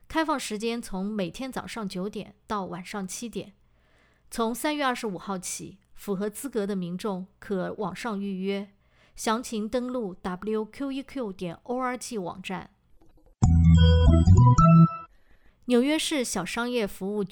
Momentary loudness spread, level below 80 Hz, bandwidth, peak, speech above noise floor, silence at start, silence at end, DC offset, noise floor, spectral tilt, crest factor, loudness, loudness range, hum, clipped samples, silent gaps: 17 LU; -38 dBFS; 18 kHz; -8 dBFS; 36 dB; 0.1 s; 0.05 s; under 0.1%; -62 dBFS; -6 dB/octave; 18 dB; -26 LUFS; 13 LU; none; under 0.1%; none